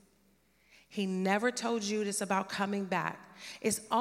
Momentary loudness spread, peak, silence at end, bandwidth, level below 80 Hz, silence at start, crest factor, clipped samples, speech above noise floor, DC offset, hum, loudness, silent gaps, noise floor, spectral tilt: 9 LU; -14 dBFS; 0 s; 16 kHz; -74 dBFS; 0.9 s; 20 dB; under 0.1%; 36 dB; under 0.1%; none; -33 LUFS; none; -69 dBFS; -4 dB/octave